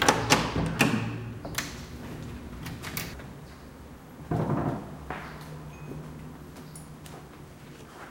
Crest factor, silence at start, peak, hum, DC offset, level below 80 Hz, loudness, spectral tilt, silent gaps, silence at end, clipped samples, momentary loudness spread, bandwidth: 30 dB; 0 s; -4 dBFS; none; under 0.1%; -48 dBFS; -31 LUFS; -4 dB/octave; none; 0 s; under 0.1%; 21 LU; 16.5 kHz